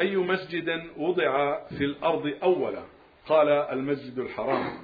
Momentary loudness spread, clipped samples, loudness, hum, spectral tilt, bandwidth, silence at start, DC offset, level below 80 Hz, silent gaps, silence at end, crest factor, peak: 8 LU; under 0.1%; -27 LUFS; none; -8.5 dB/octave; 5 kHz; 0 s; under 0.1%; -62 dBFS; none; 0 s; 18 dB; -10 dBFS